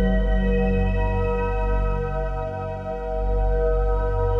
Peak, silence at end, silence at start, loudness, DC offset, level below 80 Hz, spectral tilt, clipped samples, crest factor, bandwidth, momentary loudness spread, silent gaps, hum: -10 dBFS; 0 s; 0 s; -24 LUFS; under 0.1%; -24 dBFS; -9 dB/octave; under 0.1%; 10 dB; 4 kHz; 7 LU; none; none